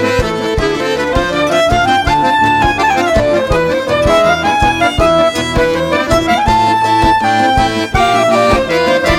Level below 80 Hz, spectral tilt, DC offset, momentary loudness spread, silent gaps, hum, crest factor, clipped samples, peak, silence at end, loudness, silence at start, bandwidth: -26 dBFS; -5 dB/octave; under 0.1%; 4 LU; none; none; 12 dB; under 0.1%; 0 dBFS; 0 s; -11 LUFS; 0 s; 16.5 kHz